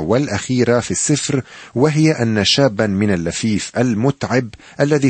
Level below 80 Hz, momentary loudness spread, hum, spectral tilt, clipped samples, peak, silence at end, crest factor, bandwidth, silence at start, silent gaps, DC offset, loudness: -48 dBFS; 6 LU; none; -5 dB/octave; under 0.1%; -2 dBFS; 0 s; 14 dB; 8.8 kHz; 0 s; none; under 0.1%; -17 LUFS